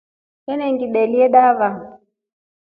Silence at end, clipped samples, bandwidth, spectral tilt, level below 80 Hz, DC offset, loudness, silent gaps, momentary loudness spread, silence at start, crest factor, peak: 0.8 s; under 0.1%; 4.8 kHz; -9.5 dB/octave; -66 dBFS; under 0.1%; -16 LUFS; none; 17 LU; 0.5 s; 16 dB; -2 dBFS